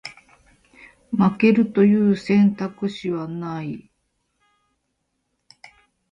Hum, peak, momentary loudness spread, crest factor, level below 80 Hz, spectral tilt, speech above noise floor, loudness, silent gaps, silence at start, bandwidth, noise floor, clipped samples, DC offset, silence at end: none; -4 dBFS; 14 LU; 18 dB; -60 dBFS; -8.5 dB/octave; 55 dB; -20 LUFS; none; 0.05 s; 7.6 kHz; -74 dBFS; under 0.1%; under 0.1%; 2.35 s